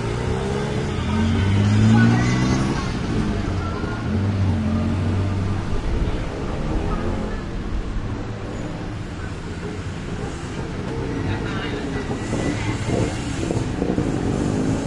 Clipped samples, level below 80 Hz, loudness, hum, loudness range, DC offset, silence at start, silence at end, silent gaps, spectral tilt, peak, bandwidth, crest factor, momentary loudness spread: under 0.1%; -32 dBFS; -23 LUFS; none; 9 LU; under 0.1%; 0 s; 0 s; none; -6.5 dB/octave; -4 dBFS; 11 kHz; 16 dB; 11 LU